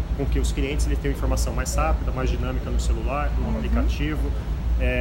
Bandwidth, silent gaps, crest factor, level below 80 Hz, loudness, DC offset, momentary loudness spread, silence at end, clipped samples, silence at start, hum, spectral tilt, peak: 16 kHz; none; 12 dB; -24 dBFS; -25 LUFS; under 0.1%; 3 LU; 0 s; under 0.1%; 0 s; none; -6 dB/octave; -10 dBFS